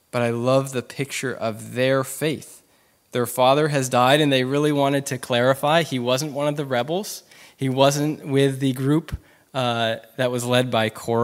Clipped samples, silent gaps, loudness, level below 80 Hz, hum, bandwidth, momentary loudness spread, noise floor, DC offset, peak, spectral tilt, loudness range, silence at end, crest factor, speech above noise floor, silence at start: under 0.1%; none; -21 LUFS; -54 dBFS; none; 16 kHz; 10 LU; -60 dBFS; under 0.1%; -2 dBFS; -5 dB/octave; 4 LU; 0 s; 20 dB; 39 dB; 0.15 s